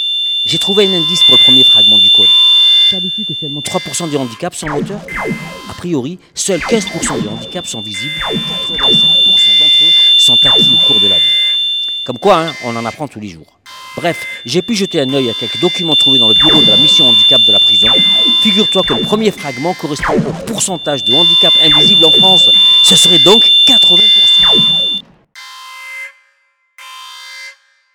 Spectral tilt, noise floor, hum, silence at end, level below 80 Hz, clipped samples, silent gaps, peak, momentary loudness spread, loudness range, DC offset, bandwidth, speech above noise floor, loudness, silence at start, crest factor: -2.5 dB/octave; -58 dBFS; none; 0.45 s; -44 dBFS; 0.2%; none; 0 dBFS; 16 LU; 13 LU; under 0.1%; over 20 kHz; 47 dB; -6 LUFS; 0 s; 10 dB